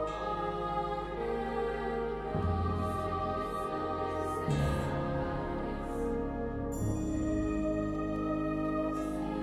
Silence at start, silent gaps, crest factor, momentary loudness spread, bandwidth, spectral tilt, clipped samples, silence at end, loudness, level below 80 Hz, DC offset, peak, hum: 0 s; none; 14 dB; 4 LU; 14 kHz; -7.5 dB/octave; under 0.1%; 0 s; -34 LUFS; -44 dBFS; under 0.1%; -20 dBFS; none